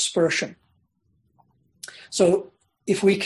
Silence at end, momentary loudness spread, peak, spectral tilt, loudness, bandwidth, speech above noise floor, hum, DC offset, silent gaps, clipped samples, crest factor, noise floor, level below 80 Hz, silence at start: 0 s; 21 LU; -6 dBFS; -4 dB/octave; -23 LUFS; 12.5 kHz; 47 dB; none; under 0.1%; none; under 0.1%; 18 dB; -68 dBFS; -64 dBFS; 0 s